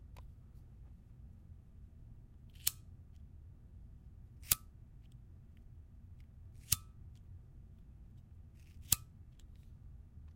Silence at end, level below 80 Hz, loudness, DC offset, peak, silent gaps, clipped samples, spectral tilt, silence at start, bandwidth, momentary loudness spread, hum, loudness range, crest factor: 0 s; -58 dBFS; -36 LUFS; under 0.1%; -6 dBFS; none; under 0.1%; -1 dB/octave; 0 s; 16 kHz; 24 LU; none; 5 LU; 40 dB